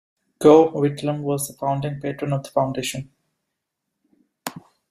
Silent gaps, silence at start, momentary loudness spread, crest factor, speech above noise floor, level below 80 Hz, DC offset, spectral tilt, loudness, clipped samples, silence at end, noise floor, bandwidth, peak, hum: none; 0.4 s; 21 LU; 20 dB; 60 dB; -60 dBFS; under 0.1%; -6 dB/octave; -21 LUFS; under 0.1%; 0.3 s; -80 dBFS; 15.5 kHz; -2 dBFS; none